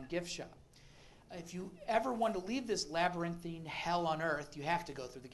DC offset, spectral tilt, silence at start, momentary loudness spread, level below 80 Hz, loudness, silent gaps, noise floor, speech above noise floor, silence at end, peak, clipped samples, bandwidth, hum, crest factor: under 0.1%; -4.5 dB/octave; 0 s; 12 LU; -64 dBFS; -38 LUFS; none; -60 dBFS; 22 dB; 0 s; -18 dBFS; under 0.1%; 12.5 kHz; none; 20 dB